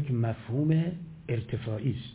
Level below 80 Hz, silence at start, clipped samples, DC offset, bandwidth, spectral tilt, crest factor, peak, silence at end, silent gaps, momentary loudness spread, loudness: -54 dBFS; 0 s; under 0.1%; under 0.1%; 4 kHz; -12 dB/octave; 16 dB; -14 dBFS; 0 s; none; 8 LU; -30 LUFS